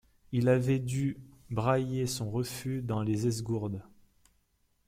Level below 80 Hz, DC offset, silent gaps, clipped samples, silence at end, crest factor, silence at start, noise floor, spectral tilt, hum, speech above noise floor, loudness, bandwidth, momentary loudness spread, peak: -58 dBFS; under 0.1%; none; under 0.1%; 1.05 s; 20 dB; 0.3 s; -72 dBFS; -6.5 dB/octave; none; 42 dB; -31 LUFS; 16 kHz; 9 LU; -12 dBFS